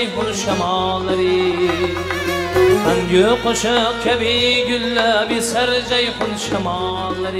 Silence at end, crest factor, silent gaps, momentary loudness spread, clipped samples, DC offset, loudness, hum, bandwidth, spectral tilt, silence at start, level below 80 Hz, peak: 0 s; 14 dB; none; 6 LU; under 0.1%; under 0.1%; -17 LUFS; none; 16 kHz; -4 dB/octave; 0 s; -40 dBFS; -2 dBFS